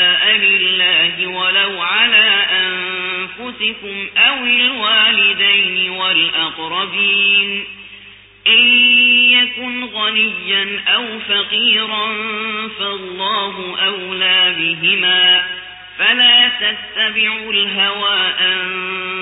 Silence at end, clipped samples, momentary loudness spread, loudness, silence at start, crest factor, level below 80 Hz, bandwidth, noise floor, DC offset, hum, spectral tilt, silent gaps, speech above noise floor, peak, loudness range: 0 s; under 0.1%; 12 LU; -12 LUFS; 0 s; 14 dB; -58 dBFS; 4 kHz; -40 dBFS; under 0.1%; none; -7 dB/octave; none; 25 dB; 0 dBFS; 5 LU